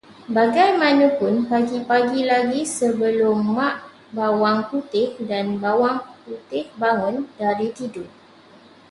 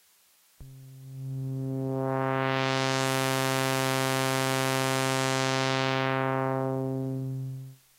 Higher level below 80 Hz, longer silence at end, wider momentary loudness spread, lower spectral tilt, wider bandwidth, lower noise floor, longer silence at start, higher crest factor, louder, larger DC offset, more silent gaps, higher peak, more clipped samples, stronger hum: about the same, -66 dBFS vs -66 dBFS; first, 0.85 s vs 0.25 s; first, 13 LU vs 10 LU; about the same, -5 dB/octave vs -4.5 dB/octave; second, 11.5 kHz vs 16 kHz; second, -48 dBFS vs -63 dBFS; second, 0.1 s vs 0.6 s; about the same, 16 dB vs 20 dB; first, -20 LUFS vs -28 LUFS; neither; neither; first, -4 dBFS vs -8 dBFS; neither; neither